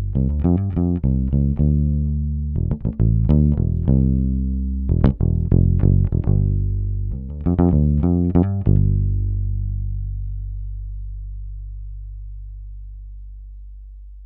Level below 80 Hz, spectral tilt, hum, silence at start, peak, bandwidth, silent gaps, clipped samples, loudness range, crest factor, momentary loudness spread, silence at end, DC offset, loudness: -24 dBFS; -14 dB/octave; 50 Hz at -35 dBFS; 0 s; -2 dBFS; 3.2 kHz; none; under 0.1%; 15 LU; 18 dB; 20 LU; 0 s; under 0.1%; -20 LUFS